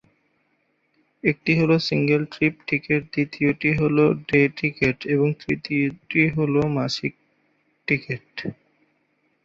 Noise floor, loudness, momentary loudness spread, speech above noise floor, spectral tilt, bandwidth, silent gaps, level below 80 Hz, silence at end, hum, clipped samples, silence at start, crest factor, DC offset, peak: -69 dBFS; -22 LUFS; 9 LU; 47 dB; -7 dB/octave; 7.6 kHz; none; -54 dBFS; 0.9 s; none; under 0.1%; 1.25 s; 20 dB; under 0.1%; -2 dBFS